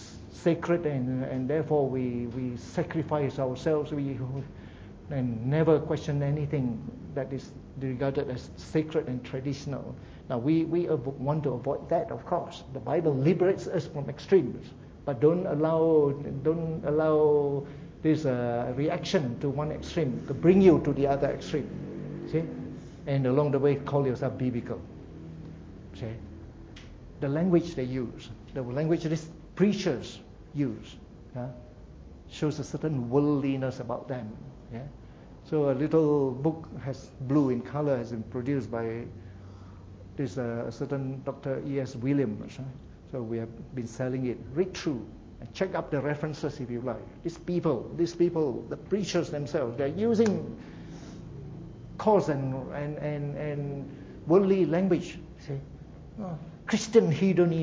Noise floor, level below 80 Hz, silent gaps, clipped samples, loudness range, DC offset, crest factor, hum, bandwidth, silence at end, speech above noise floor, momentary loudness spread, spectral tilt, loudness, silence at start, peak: -48 dBFS; -52 dBFS; none; under 0.1%; 7 LU; under 0.1%; 20 dB; none; 7.8 kHz; 0 s; 20 dB; 19 LU; -7.5 dB/octave; -29 LUFS; 0 s; -8 dBFS